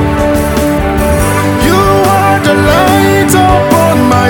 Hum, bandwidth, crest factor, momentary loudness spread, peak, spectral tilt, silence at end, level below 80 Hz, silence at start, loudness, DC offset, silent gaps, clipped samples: none; 19.5 kHz; 8 dB; 4 LU; 0 dBFS; -5.5 dB/octave; 0 s; -20 dBFS; 0 s; -8 LUFS; under 0.1%; none; under 0.1%